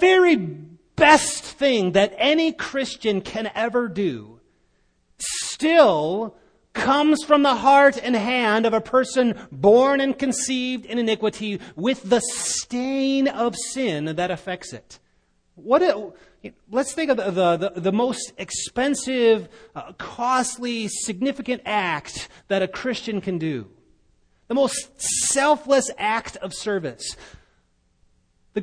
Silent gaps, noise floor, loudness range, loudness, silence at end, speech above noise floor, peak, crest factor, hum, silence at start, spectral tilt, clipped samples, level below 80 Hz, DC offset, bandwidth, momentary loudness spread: none; -64 dBFS; 7 LU; -21 LUFS; 0 s; 43 dB; 0 dBFS; 20 dB; none; 0 s; -3.5 dB/octave; under 0.1%; -56 dBFS; under 0.1%; 10.5 kHz; 15 LU